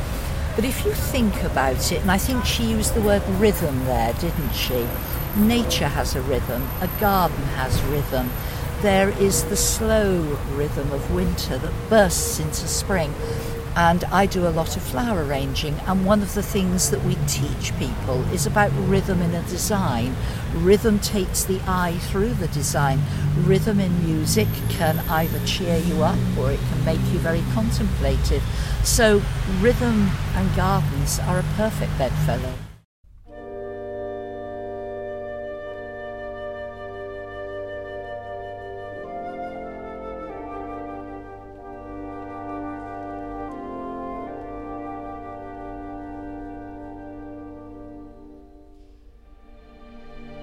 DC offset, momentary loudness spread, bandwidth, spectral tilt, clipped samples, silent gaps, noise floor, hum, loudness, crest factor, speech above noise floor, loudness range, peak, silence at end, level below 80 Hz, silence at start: under 0.1%; 16 LU; 16.5 kHz; -5 dB/octave; under 0.1%; 32.85-33.04 s; -48 dBFS; none; -22 LUFS; 18 dB; 27 dB; 14 LU; -4 dBFS; 0 s; -32 dBFS; 0 s